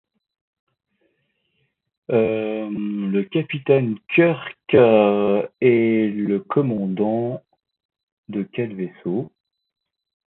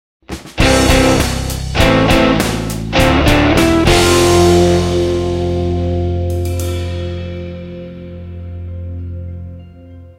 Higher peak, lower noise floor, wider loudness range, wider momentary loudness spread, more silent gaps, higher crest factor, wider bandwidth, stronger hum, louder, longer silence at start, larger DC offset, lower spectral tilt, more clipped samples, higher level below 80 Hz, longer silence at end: about the same, -2 dBFS vs 0 dBFS; first, -71 dBFS vs -36 dBFS; second, 9 LU vs 13 LU; second, 13 LU vs 19 LU; first, 7.85-7.89 s, 8.03-8.24 s vs none; about the same, 18 dB vs 14 dB; second, 4.1 kHz vs 16.5 kHz; neither; second, -20 LUFS vs -13 LUFS; first, 2.1 s vs 0.3 s; neither; first, -12 dB/octave vs -5 dB/octave; neither; second, -62 dBFS vs -24 dBFS; first, 1 s vs 0.05 s